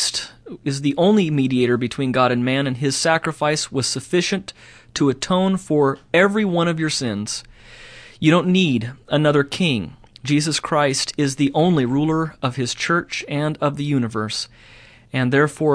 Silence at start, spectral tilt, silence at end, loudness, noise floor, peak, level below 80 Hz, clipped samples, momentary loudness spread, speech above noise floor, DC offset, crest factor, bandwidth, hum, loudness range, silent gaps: 0 s; -5 dB/octave; 0 s; -20 LUFS; -42 dBFS; -2 dBFS; -52 dBFS; under 0.1%; 9 LU; 23 dB; under 0.1%; 18 dB; 11 kHz; none; 2 LU; none